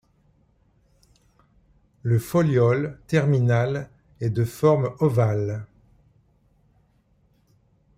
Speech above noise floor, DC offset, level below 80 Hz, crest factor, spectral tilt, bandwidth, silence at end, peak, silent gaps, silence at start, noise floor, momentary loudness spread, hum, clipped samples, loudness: 42 dB; under 0.1%; -56 dBFS; 18 dB; -8 dB/octave; 15.5 kHz; 2.3 s; -6 dBFS; none; 2.05 s; -63 dBFS; 11 LU; none; under 0.1%; -23 LUFS